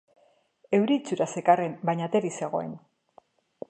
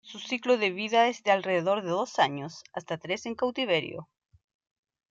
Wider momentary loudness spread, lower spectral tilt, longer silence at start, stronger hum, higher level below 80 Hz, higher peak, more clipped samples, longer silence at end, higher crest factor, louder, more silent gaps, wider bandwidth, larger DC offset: second, 9 LU vs 14 LU; first, -6 dB/octave vs -4.5 dB/octave; first, 0.7 s vs 0.05 s; neither; about the same, -78 dBFS vs -74 dBFS; first, -6 dBFS vs -10 dBFS; neither; second, 0.9 s vs 1.05 s; about the same, 22 dB vs 20 dB; about the same, -26 LUFS vs -27 LUFS; neither; first, 9.4 kHz vs 7.8 kHz; neither